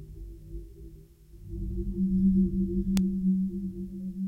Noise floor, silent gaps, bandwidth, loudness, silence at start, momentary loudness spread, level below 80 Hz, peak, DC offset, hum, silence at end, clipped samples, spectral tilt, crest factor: -50 dBFS; none; 10 kHz; -29 LUFS; 0 s; 21 LU; -40 dBFS; -6 dBFS; under 0.1%; none; 0 s; under 0.1%; -9 dB/octave; 22 dB